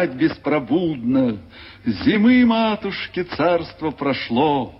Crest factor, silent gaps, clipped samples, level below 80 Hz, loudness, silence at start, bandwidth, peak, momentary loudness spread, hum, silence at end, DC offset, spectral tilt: 14 dB; none; under 0.1%; -50 dBFS; -20 LUFS; 0 s; 5.8 kHz; -6 dBFS; 11 LU; none; 0.05 s; under 0.1%; -9 dB/octave